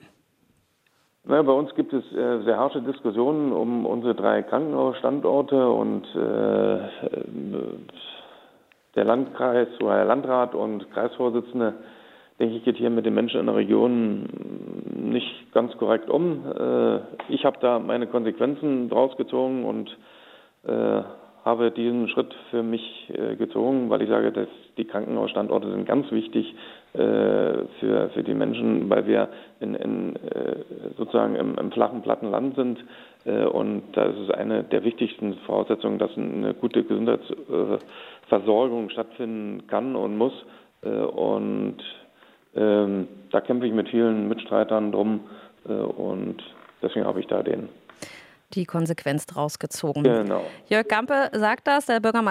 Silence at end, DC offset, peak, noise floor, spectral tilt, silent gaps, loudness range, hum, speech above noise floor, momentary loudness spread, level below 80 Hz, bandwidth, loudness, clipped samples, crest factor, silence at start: 0 s; under 0.1%; -4 dBFS; -66 dBFS; -6.5 dB/octave; none; 3 LU; none; 43 dB; 11 LU; -76 dBFS; 14.5 kHz; -24 LUFS; under 0.1%; 20 dB; 1.25 s